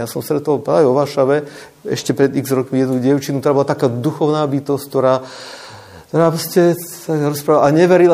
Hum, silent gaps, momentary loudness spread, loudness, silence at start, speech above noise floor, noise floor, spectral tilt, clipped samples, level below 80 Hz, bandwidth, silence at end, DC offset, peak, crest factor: none; none; 10 LU; -16 LUFS; 0 s; 22 dB; -37 dBFS; -6.5 dB/octave; under 0.1%; -60 dBFS; 15.5 kHz; 0 s; under 0.1%; 0 dBFS; 14 dB